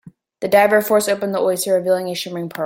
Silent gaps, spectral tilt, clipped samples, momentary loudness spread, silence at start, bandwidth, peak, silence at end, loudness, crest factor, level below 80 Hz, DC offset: none; -4 dB/octave; under 0.1%; 11 LU; 0.05 s; 16.5 kHz; -2 dBFS; 0 s; -17 LUFS; 16 dB; -64 dBFS; under 0.1%